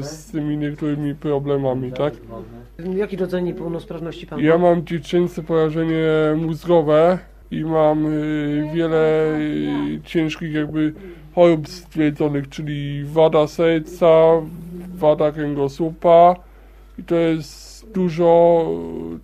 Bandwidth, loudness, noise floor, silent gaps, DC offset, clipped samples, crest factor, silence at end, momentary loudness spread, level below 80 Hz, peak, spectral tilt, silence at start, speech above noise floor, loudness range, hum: 13.5 kHz; -19 LUFS; -44 dBFS; none; under 0.1%; under 0.1%; 18 dB; 0.05 s; 15 LU; -44 dBFS; 0 dBFS; -7.5 dB/octave; 0 s; 25 dB; 6 LU; none